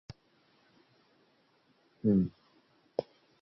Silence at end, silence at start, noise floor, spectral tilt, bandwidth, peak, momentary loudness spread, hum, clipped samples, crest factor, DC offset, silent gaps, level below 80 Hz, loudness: 0.4 s; 2.05 s; -70 dBFS; -10.5 dB/octave; 6 kHz; -14 dBFS; 27 LU; none; under 0.1%; 22 dB; under 0.1%; none; -64 dBFS; -33 LUFS